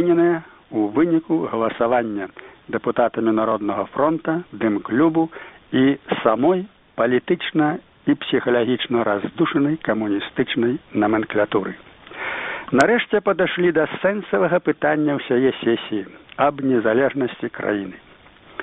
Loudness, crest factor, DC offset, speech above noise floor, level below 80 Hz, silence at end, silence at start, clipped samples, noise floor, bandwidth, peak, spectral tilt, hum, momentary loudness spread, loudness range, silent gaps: -20 LUFS; 20 dB; under 0.1%; 28 dB; -58 dBFS; 0 s; 0 s; under 0.1%; -47 dBFS; 6.2 kHz; 0 dBFS; -4.5 dB/octave; none; 9 LU; 2 LU; none